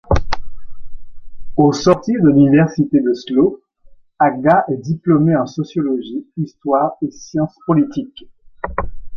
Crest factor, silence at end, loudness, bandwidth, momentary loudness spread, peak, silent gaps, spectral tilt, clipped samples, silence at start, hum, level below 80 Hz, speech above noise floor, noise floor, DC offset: 16 dB; 0 s; -16 LUFS; 7.2 kHz; 14 LU; 0 dBFS; none; -7.5 dB/octave; under 0.1%; 0.1 s; none; -34 dBFS; 29 dB; -44 dBFS; under 0.1%